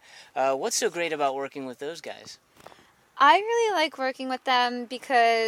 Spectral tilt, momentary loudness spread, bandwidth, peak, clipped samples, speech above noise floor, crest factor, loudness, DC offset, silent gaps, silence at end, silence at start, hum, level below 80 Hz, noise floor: -1.5 dB/octave; 17 LU; 16 kHz; -4 dBFS; under 0.1%; 31 dB; 22 dB; -25 LUFS; under 0.1%; none; 0 s; 0.15 s; none; -80 dBFS; -56 dBFS